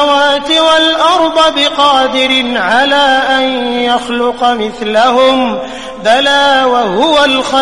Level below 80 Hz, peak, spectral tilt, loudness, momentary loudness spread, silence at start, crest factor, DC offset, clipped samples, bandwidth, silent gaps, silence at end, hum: -44 dBFS; 0 dBFS; -2.5 dB/octave; -9 LUFS; 5 LU; 0 s; 10 dB; 1%; under 0.1%; 11.5 kHz; none; 0 s; none